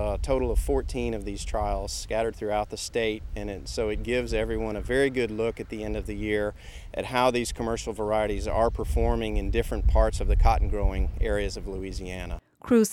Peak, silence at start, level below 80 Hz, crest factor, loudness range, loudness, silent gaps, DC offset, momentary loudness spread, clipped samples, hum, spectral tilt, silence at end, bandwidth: -8 dBFS; 0 s; -30 dBFS; 18 dB; 3 LU; -28 LUFS; none; under 0.1%; 11 LU; under 0.1%; none; -5.5 dB/octave; 0 s; 15 kHz